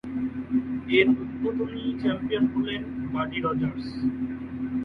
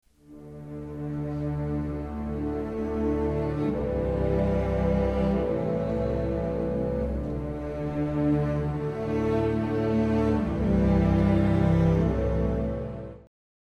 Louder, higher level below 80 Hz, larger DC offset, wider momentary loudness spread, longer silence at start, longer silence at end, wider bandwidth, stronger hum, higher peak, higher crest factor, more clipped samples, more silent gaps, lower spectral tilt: about the same, -27 LUFS vs -27 LUFS; second, -52 dBFS vs -36 dBFS; neither; about the same, 9 LU vs 10 LU; second, 0.05 s vs 0.3 s; second, 0 s vs 0.55 s; second, 5 kHz vs 8.4 kHz; neither; first, -6 dBFS vs -10 dBFS; about the same, 20 dB vs 16 dB; neither; neither; second, -8 dB/octave vs -9.5 dB/octave